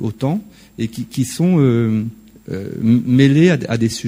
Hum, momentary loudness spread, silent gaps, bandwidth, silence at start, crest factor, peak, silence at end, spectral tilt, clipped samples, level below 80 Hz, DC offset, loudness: none; 14 LU; none; 16 kHz; 0 s; 16 dB; 0 dBFS; 0 s; -7 dB/octave; under 0.1%; -50 dBFS; under 0.1%; -16 LUFS